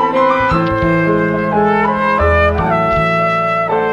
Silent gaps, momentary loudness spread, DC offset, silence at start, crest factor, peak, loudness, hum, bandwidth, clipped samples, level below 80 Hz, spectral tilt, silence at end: none; 2 LU; under 0.1%; 0 s; 12 dB; -2 dBFS; -13 LUFS; none; 8.8 kHz; under 0.1%; -28 dBFS; -8 dB/octave; 0 s